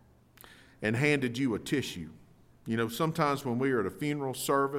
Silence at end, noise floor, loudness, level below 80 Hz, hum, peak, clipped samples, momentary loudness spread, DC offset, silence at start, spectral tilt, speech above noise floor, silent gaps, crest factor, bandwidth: 0 s; -57 dBFS; -31 LUFS; -64 dBFS; none; -12 dBFS; under 0.1%; 9 LU; under 0.1%; 0.45 s; -5.5 dB/octave; 27 dB; none; 18 dB; 16.5 kHz